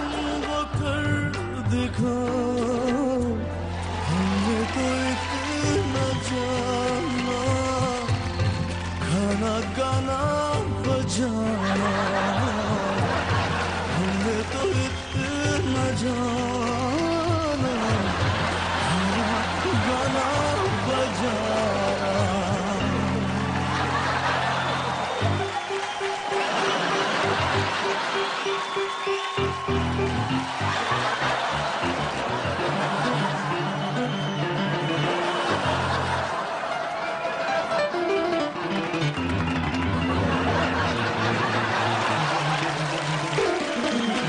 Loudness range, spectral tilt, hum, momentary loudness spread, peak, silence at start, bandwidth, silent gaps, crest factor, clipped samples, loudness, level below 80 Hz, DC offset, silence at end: 2 LU; -5 dB/octave; none; 3 LU; -10 dBFS; 0 s; 10 kHz; none; 14 dB; under 0.1%; -25 LUFS; -44 dBFS; under 0.1%; 0 s